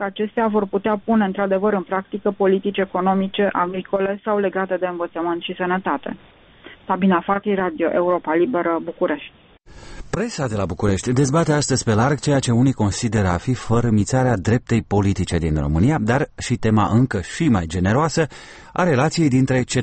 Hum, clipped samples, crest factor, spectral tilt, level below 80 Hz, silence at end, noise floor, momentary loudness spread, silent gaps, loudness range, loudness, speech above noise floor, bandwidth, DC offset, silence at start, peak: none; under 0.1%; 14 dB; -6 dB/octave; -40 dBFS; 0 s; -45 dBFS; 7 LU; none; 4 LU; -20 LUFS; 25 dB; 8.8 kHz; under 0.1%; 0 s; -6 dBFS